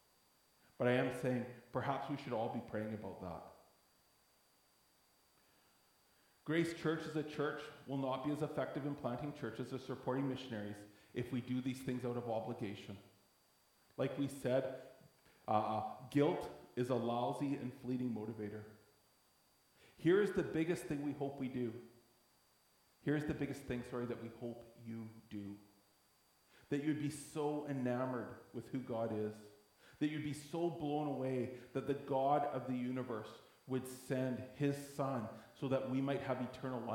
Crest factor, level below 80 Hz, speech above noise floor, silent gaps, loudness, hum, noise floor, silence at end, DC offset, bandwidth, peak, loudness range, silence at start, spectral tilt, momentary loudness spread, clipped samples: 22 dB; -74 dBFS; 33 dB; none; -41 LUFS; none; -73 dBFS; 0 s; under 0.1%; 18.5 kHz; -20 dBFS; 5 LU; 0.8 s; -7 dB/octave; 13 LU; under 0.1%